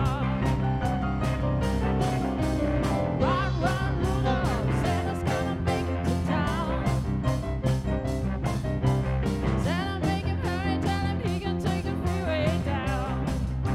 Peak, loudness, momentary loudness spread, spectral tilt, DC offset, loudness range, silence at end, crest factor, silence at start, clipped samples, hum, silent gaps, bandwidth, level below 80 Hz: -10 dBFS; -27 LUFS; 3 LU; -7 dB/octave; under 0.1%; 1 LU; 0 s; 16 dB; 0 s; under 0.1%; none; none; 13.5 kHz; -34 dBFS